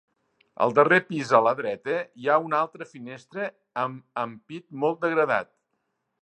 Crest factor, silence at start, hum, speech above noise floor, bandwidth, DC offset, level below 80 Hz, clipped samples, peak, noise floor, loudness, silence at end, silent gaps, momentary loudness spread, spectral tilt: 22 dB; 0.6 s; none; 52 dB; 8.8 kHz; under 0.1%; -76 dBFS; under 0.1%; -4 dBFS; -77 dBFS; -25 LUFS; 0.8 s; none; 18 LU; -6 dB/octave